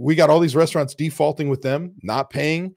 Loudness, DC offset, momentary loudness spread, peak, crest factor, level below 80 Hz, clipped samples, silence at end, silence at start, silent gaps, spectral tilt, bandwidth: -20 LUFS; under 0.1%; 10 LU; -2 dBFS; 16 dB; -60 dBFS; under 0.1%; 0.05 s; 0 s; none; -6 dB/octave; 16.5 kHz